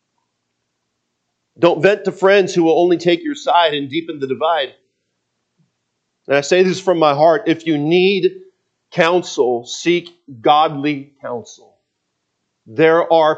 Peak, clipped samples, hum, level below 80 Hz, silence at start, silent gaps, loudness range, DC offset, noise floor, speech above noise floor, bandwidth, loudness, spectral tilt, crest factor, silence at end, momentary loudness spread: 0 dBFS; under 0.1%; none; -68 dBFS; 1.6 s; none; 5 LU; under 0.1%; -73 dBFS; 58 dB; 8.2 kHz; -15 LUFS; -5 dB/octave; 16 dB; 0 s; 11 LU